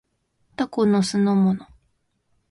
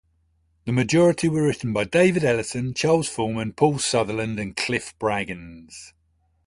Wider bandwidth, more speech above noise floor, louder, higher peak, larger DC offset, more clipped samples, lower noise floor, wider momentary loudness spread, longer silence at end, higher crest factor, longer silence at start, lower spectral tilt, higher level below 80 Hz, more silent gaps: about the same, 11.5 kHz vs 11.5 kHz; first, 50 dB vs 44 dB; about the same, -21 LUFS vs -22 LUFS; second, -8 dBFS vs -4 dBFS; neither; neither; first, -70 dBFS vs -66 dBFS; second, 11 LU vs 16 LU; first, 0.85 s vs 0.6 s; second, 14 dB vs 20 dB; about the same, 0.6 s vs 0.65 s; first, -6.5 dB/octave vs -5 dB/octave; second, -62 dBFS vs -52 dBFS; neither